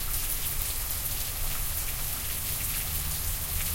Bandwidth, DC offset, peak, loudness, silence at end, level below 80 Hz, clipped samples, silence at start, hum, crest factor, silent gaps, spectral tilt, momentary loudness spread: 17 kHz; under 0.1%; -10 dBFS; -29 LUFS; 0 s; -36 dBFS; under 0.1%; 0 s; none; 20 dB; none; -1.5 dB/octave; 2 LU